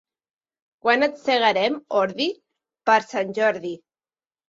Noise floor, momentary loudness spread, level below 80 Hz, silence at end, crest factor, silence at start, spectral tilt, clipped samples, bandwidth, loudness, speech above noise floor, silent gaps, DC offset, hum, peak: under -90 dBFS; 11 LU; -72 dBFS; 0.7 s; 18 dB; 0.85 s; -4 dB/octave; under 0.1%; 7.8 kHz; -22 LUFS; over 69 dB; none; under 0.1%; none; -4 dBFS